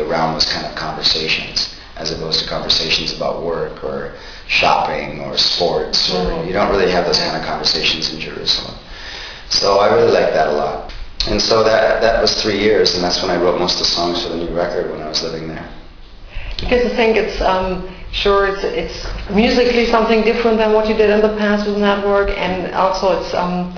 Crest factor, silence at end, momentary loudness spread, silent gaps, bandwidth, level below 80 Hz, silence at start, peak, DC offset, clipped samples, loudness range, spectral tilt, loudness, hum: 16 dB; 0 s; 12 LU; none; 5.4 kHz; -32 dBFS; 0 s; 0 dBFS; under 0.1%; under 0.1%; 4 LU; -4 dB/octave; -15 LUFS; none